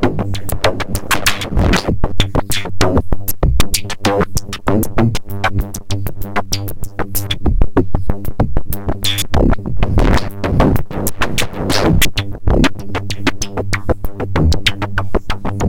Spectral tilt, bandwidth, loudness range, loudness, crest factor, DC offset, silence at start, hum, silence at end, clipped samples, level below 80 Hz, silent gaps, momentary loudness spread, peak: -4.5 dB/octave; 17 kHz; 3 LU; -17 LUFS; 14 dB; under 0.1%; 0 s; none; 0 s; under 0.1%; -20 dBFS; none; 7 LU; 0 dBFS